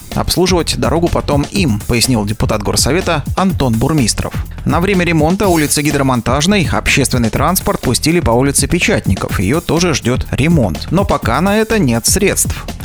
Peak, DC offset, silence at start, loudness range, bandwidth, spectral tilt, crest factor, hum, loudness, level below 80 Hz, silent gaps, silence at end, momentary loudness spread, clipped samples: 0 dBFS; under 0.1%; 0 s; 1 LU; over 20 kHz; -4.5 dB/octave; 12 dB; none; -13 LUFS; -26 dBFS; none; 0 s; 4 LU; under 0.1%